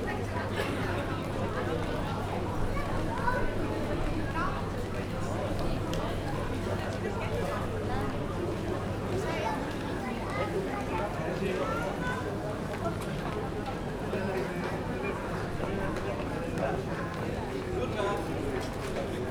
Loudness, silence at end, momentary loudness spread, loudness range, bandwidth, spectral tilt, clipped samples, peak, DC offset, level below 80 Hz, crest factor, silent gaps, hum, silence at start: -33 LUFS; 0 s; 3 LU; 1 LU; 18 kHz; -6.5 dB/octave; under 0.1%; -16 dBFS; under 0.1%; -42 dBFS; 16 dB; none; none; 0 s